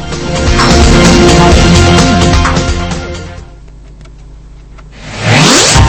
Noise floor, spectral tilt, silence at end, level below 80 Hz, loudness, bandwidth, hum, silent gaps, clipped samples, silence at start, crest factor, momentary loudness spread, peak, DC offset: -31 dBFS; -4.5 dB/octave; 0 s; -16 dBFS; -7 LUFS; 11 kHz; none; none; 3%; 0 s; 8 dB; 15 LU; 0 dBFS; under 0.1%